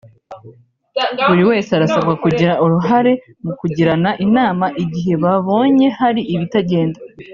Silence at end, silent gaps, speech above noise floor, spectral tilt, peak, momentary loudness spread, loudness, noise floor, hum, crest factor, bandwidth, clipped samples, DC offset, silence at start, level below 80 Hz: 0 s; none; 29 dB; -5.5 dB/octave; -2 dBFS; 8 LU; -15 LUFS; -44 dBFS; none; 14 dB; 7.2 kHz; under 0.1%; under 0.1%; 0.3 s; -52 dBFS